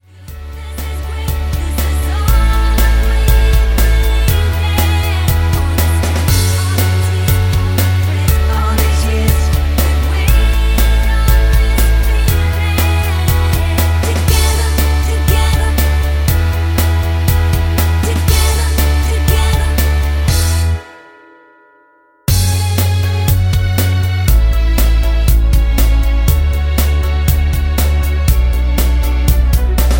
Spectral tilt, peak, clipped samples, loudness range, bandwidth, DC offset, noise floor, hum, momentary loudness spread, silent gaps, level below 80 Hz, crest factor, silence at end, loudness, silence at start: -5 dB/octave; 0 dBFS; under 0.1%; 2 LU; 17 kHz; under 0.1%; -50 dBFS; none; 2 LU; none; -14 dBFS; 12 dB; 0 s; -14 LUFS; 0.2 s